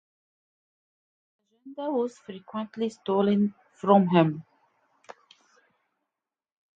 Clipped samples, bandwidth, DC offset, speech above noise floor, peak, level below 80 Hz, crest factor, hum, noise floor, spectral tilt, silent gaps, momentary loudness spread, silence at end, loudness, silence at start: under 0.1%; 7.6 kHz; under 0.1%; 63 dB; -6 dBFS; -76 dBFS; 24 dB; none; -88 dBFS; -8 dB/octave; none; 17 LU; 2.35 s; -26 LUFS; 1.65 s